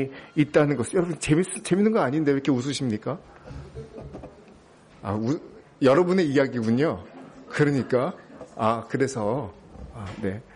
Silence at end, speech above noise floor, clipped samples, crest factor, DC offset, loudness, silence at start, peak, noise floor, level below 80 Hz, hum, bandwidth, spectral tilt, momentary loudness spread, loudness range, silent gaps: 0.15 s; 28 dB; under 0.1%; 16 dB; under 0.1%; -24 LUFS; 0 s; -8 dBFS; -52 dBFS; -54 dBFS; none; 10.5 kHz; -6 dB/octave; 20 LU; 6 LU; none